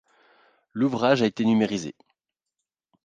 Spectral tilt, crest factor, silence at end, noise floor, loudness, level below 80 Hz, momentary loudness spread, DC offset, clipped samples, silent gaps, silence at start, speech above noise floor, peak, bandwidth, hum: -6 dB/octave; 20 dB; 1.15 s; -85 dBFS; -23 LUFS; -66 dBFS; 15 LU; under 0.1%; under 0.1%; none; 0.75 s; 62 dB; -6 dBFS; 9 kHz; none